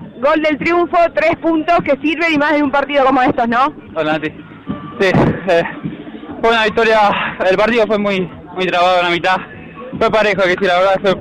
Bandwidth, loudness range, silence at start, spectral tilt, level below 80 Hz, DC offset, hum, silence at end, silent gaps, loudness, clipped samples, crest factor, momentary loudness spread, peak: 11.5 kHz; 2 LU; 0 s; -6 dB/octave; -42 dBFS; under 0.1%; none; 0 s; none; -14 LUFS; under 0.1%; 10 dB; 13 LU; -6 dBFS